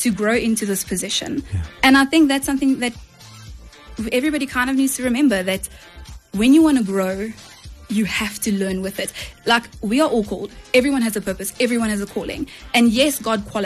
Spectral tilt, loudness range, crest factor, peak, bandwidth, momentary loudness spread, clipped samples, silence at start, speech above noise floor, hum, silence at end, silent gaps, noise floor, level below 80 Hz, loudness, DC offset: -4 dB/octave; 3 LU; 16 dB; -4 dBFS; 13 kHz; 13 LU; under 0.1%; 0 s; 21 dB; none; 0 s; none; -40 dBFS; -42 dBFS; -19 LUFS; under 0.1%